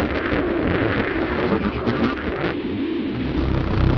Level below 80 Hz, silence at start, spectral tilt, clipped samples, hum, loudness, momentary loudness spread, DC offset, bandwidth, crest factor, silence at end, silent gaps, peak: -30 dBFS; 0 s; -9 dB/octave; under 0.1%; none; -22 LUFS; 4 LU; under 0.1%; 6.4 kHz; 14 dB; 0 s; none; -6 dBFS